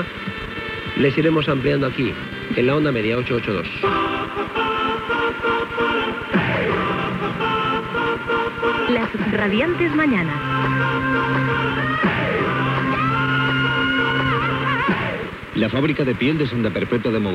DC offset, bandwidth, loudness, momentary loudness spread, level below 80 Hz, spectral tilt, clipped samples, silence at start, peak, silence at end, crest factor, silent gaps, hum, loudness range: under 0.1%; 11.5 kHz; -20 LUFS; 5 LU; -44 dBFS; -7 dB/octave; under 0.1%; 0 s; -6 dBFS; 0 s; 14 dB; none; none; 2 LU